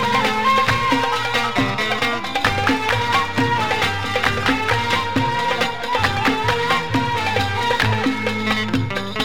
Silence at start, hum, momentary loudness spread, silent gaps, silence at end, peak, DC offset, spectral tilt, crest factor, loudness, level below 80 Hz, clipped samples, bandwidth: 0 s; none; 3 LU; none; 0 s; -4 dBFS; 2%; -4.5 dB/octave; 14 dB; -19 LUFS; -42 dBFS; under 0.1%; 17 kHz